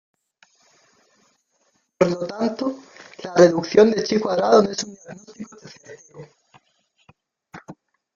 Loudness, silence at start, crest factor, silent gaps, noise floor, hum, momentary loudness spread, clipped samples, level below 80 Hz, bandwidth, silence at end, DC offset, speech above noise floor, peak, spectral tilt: -19 LUFS; 2 s; 20 dB; none; -67 dBFS; none; 26 LU; under 0.1%; -64 dBFS; 7.4 kHz; 0.45 s; under 0.1%; 47 dB; -2 dBFS; -5.5 dB/octave